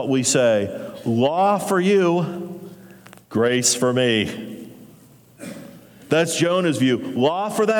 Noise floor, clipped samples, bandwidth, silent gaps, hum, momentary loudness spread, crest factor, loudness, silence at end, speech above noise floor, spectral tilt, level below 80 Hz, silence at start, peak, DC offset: -49 dBFS; under 0.1%; 19.5 kHz; none; none; 19 LU; 16 dB; -19 LUFS; 0 s; 30 dB; -4 dB/octave; -66 dBFS; 0 s; -4 dBFS; under 0.1%